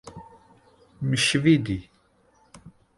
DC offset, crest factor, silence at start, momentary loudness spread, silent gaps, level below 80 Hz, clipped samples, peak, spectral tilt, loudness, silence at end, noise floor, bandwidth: under 0.1%; 20 dB; 0.05 s; 14 LU; none; -52 dBFS; under 0.1%; -8 dBFS; -4.5 dB/octave; -23 LUFS; 0.3 s; -62 dBFS; 11.5 kHz